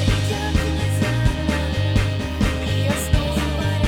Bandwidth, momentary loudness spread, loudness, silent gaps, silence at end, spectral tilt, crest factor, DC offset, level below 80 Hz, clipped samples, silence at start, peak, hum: 17 kHz; 2 LU; -21 LUFS; none; 0 s; -5.5 dB/octave; 16 dB; 0.1%; -26 dBFS; under 0.1%; 0 s; -4 dBFS; none